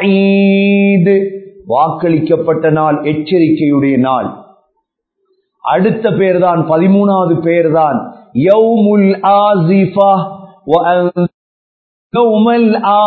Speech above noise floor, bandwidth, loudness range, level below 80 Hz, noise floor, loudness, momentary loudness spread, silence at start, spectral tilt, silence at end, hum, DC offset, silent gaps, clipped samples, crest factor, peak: 58 dB; 4.5 kHz; 4 LU; -56 dBFS; -67 dBFS; -11 LUFS; 8 LU; 0 s; -10.5 dB/octave; 0 s; none; under 0.1%; 11.34-12.10 s; under 0.1%; 10 dB; 0 dBFS